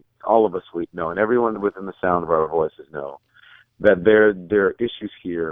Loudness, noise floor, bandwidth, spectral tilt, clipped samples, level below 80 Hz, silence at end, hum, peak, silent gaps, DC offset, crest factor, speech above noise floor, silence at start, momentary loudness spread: -20 LUFS; -51 dBFS; 3.8 kHz; -9 dB/octave; under 0.1%; -54 dBFS; 0 s; none; -2 dBFS; none; under 0.1%; 20 dB; 32 dB; 0.25 s; 15 LU